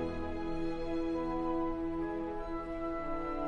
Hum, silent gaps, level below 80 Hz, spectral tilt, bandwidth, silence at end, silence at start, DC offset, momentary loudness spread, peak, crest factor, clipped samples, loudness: none; none; -44 dBFS; -8 dB/octave; 7 kHz; 0 s; 0 s; under 0.1%; 4 LU; -24 dBFS; 12 dB; under 0.1%; -37 LUFS